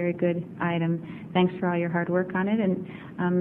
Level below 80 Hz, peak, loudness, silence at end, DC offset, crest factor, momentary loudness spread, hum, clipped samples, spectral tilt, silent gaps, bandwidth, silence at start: -64 dBFS; -10 dBFS; -27 LUFS; 0 s; under 0.1%; 16 dB; 6 LU; none; under 0.1%; -10 dB/octave; none; 3.8 kHz; 0 s